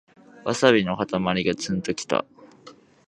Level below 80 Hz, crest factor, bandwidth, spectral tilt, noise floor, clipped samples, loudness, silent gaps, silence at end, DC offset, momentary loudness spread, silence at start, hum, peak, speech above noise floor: -56 dBFS; 24 dB; 11.5 kHz; -4.5 dB/octave; -50 dBFS; under 0.1%; -23 LUFS; none; 0.35 s; under 0.1%; 9 LU; 0.35 s; none; -2 dBFS; 27 dB